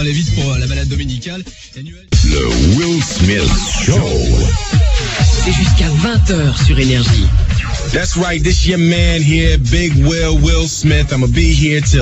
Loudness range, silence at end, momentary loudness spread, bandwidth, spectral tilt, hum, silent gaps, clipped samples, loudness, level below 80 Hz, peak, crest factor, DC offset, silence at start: 2 LU; 0 s; 6 LU; 8.2 kHz; -5 dB/octave; none; none; under 0.1%; -13 LUFS; -16 dBFS; 0 dBFS; 12 dB; under 0.1%; 0 s